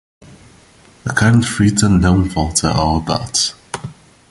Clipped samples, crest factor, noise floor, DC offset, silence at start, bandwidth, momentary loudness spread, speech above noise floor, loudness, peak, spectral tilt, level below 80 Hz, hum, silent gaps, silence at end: under 0.1%; 16 dB; -46 dBFS; under 0.1%; 1.05 s; 11.5 kHz; 16 LU; 32 dB; -15 LUFS; 0 dBFS; -4.5 dB/octave; -30 dBFS; none; none; 0.4 s